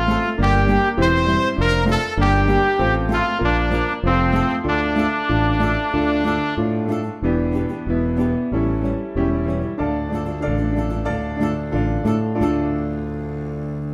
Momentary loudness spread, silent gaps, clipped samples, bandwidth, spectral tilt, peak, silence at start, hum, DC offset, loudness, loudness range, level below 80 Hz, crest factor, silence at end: 7 LU; none; under 0.1%; 11.5 kHz; -7.5 dB/octave; -4 dBFS; 0 s; none; under 0.1%; -20 LUFS; 4 LU; -28 dBFS; 16 dB; 0 s